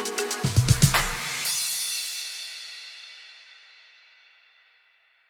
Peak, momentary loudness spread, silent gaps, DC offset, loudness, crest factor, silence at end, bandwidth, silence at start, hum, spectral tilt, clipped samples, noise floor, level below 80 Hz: -4 dBFS; 23 LU; none; under 0.1%; -24 LUFS; 24 dB; 1.75 s; 19.5 kHz; 0 s; none; -3 dB/octave; under 0.1%; -63 dBFS; -42 dBFS